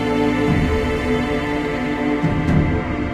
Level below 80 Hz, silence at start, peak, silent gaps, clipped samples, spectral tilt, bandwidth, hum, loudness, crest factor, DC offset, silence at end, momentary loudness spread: -30 dBFS; 0 s; -4 dBFS; none; under 0.1%; -7.5 dB/octave; 13.5 kHz; none; -19 LUFS; 14 dB; under 0.1%; 0 s; 4 LU